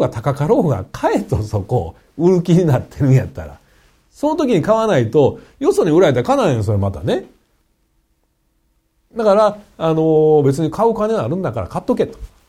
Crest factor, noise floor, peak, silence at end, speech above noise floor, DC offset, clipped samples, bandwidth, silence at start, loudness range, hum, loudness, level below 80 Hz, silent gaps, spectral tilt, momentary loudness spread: 14 dB; -63 dBFS; -2 dBFS; 0.2 s; 48 dB; under 0.1%; under 0.1%; 15 kHz; 0 s; 4 LU; none; -16 LUFS; -42 dBFS; none; -7.5 dB/octave; 9 LU